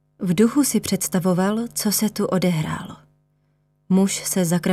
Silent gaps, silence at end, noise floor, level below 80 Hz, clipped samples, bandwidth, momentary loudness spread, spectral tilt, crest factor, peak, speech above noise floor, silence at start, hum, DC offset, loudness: none; 0 s; -65 dBFS; -56 dBFS; under 0.1%; 16 kHz; 7 LU; -5 dB/octave; 16 dB; -6 dBFS; 45 dB; 0.2 s; 50 Hz at -45 dBFS; under 0.1%; -21 LUFS